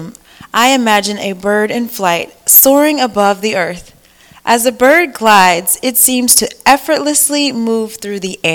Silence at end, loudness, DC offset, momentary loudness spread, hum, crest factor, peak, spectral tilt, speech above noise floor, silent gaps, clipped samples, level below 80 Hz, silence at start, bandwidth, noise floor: 0 s; -10 LUFS; under 0.1%; 11 LU; none; 12 dB; 0 dBFS; -2 dB/octave; 32 dB; none; 1%; -50 dBFS; 0 s; over 20 kHz; -44 dBFS